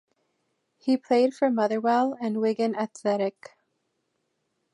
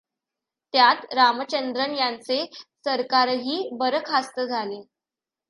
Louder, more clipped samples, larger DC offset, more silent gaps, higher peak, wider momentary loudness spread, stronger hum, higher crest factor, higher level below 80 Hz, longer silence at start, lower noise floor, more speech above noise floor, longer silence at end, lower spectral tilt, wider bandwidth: about the same, -25 LUFS vs -23 LUFS; neither; neither; neither; second, -10 dBFS vs -4 dBFS; second, 6 LU vs 10 LU; neither; about the same, 16 dB vs 20 dB; about the same, -82 dBFS vs -82 dBFS; about the same, 0.85 s vs 0.75 s; second, -76 dBFS vs -90 dBFS; second, 52 dB vs 67 dB; first, 1.45 s vs 0.65 s; first, -6 dB/octave vs -3 dB/octave; about the same, 10.5 kHz vs 11.5 kHz